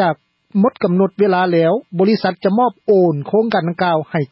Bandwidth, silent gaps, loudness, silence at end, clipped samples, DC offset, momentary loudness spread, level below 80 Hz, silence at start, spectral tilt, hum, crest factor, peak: 5.8 kHz; none; -16 LUFS; 0.05 s; under 0.1%; under 0.1%; 4 LU; -62 dBFS; 0 s; -11 dB/octave; none; 12 dB; -4 dBFS